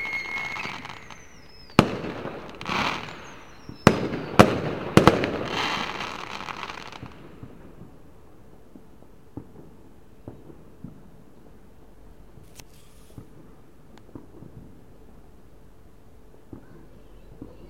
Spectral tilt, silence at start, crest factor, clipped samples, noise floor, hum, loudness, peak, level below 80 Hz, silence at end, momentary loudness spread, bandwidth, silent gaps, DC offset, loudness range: -5.5 dB/octave; 0 s; 30 dB; under 0.1%; -52 dBFS; none; -24 LUFS; 0 dBFS; -50 dBFS; 0 s; 28 LU; 16.5 kHz; none; 0.4%; 26 LU